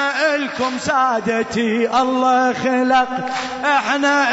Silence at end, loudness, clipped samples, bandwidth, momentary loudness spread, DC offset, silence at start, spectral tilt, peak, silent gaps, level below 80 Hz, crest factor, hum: 0 s; -17 LUFS; under 0.1%; 8 kHz; 6 LU; under 0.1%; 0 s; -3.5 dB/octave; -6 dBFS; none; -56 dBFS; 12 dB; none